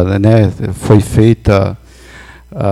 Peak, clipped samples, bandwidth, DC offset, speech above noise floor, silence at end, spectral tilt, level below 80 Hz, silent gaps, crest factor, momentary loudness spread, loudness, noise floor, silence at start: 0 dBFS; 1%; 12.5 kHz; under 0.1%; 26 dB; 0 s; -8 dB/octave; -30 dBFS; none; 12 dB; 12 LU; -11 LUFS; -36 dBFS; 0 s